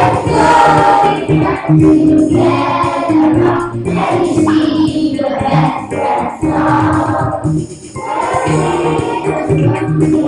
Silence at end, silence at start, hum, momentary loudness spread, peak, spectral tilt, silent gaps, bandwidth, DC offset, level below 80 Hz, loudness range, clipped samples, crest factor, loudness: 0 s; 0 s; none; 8 LU; 0 dBFS; -7 dB/octave; none; 11 kHz; under 0.1%; -36 dBFS; 5 LU; under 0.1%; 12 dB; -12 LUFS